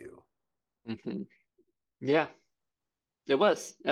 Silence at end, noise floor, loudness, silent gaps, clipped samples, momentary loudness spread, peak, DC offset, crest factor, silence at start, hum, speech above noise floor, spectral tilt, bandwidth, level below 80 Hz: 0 s; -90 dBFS; -30 LUFS; none; under 0.1%; 23 LU; -12 dBFS; under 0.1%; 22 dB; 0 s; none; 60 dB; -4.5 dB/octave; 14 kHz; -78 dBFS